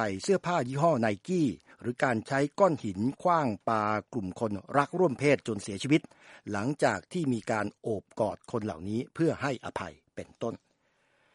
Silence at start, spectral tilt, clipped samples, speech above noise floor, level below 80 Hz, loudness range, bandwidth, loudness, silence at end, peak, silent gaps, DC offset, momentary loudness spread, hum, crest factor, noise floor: 0 s; -6 dB/octave; under 0.1%; 42 dB; -68 dBFS; 5 LU; 11.5 kHz; -30 LUFS; 0.8 s; -8 dBFS; none; under 0.1%; 11 LU; none; 22 dB; -71 dBFS